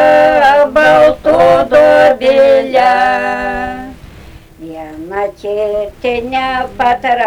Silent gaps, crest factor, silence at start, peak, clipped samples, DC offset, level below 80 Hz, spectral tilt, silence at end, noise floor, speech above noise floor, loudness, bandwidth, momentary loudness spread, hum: none; 10 dB; 0 s; 0 dBFS; under 0.1%; under 0.1%; -38 dBFS; -5 dB/octave; 0 s; -35 dBFS; 21 dB; -10 LUFS; 13 kHz; 15 LU; none